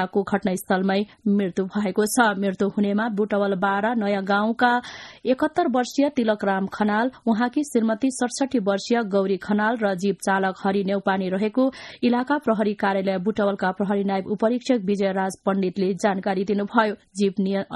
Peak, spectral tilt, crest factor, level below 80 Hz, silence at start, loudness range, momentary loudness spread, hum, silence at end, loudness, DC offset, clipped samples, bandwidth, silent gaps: -4 dBFS; -5.5 dB/octave; 18 dB; -62 dBFS; 0 s; 1 LU; 3 LU; none; 0 s; -23 LUFS; under 0.1%; under 0.1%; 12 kHz; none